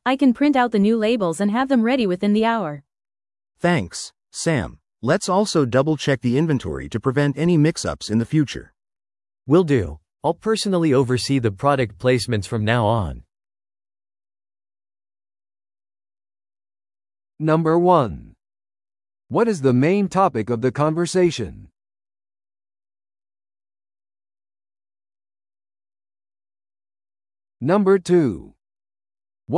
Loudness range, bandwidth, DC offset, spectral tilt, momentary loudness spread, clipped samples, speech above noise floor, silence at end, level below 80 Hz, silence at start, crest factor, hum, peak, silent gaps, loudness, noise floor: 6 LU; 12 kHz; under 0.1%; -6 dB/octave; 10 LU; under 0.1%; over 71 dB; 0 s; -50 dBFS; 0.05 s; 18 dB; none; -2 dBFS; none; -20 LUFS; under -90 dBFS